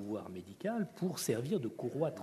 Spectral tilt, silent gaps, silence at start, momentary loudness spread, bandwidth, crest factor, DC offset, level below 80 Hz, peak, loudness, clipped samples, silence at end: -5.5 dB/octave; none; 0 s; 7 LU; 13.5 kHz; 16 dB; under 0.1%; -78 dBFS; -20 dBFS; -38 LUFS; under 0.1%; 0 s